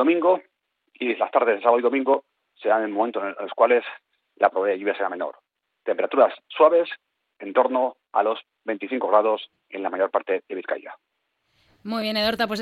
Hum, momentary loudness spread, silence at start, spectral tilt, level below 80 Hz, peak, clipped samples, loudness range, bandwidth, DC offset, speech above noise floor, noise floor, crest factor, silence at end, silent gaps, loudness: none; 12 LU; 0 s; -5.5 dB/octave; -68 dBFS; -4 dBFS; under 0.1%; 4 LU; 14 kHz; under 0.1%; 47 dB; -70 dBFS; 20 dB; 0 s; none; -23 LUFS